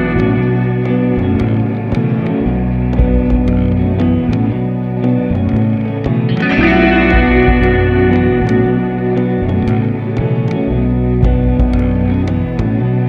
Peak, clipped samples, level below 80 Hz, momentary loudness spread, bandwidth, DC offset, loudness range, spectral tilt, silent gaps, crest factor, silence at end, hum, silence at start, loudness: 0 dBFS; under 0.1%; -20 dBFS; 6 LU; 6.2 kHz; under 0.1%; 3 LU; -9.5 dB/octave; none; 12 dB; 0 s; none; 0 s; -13 LUFS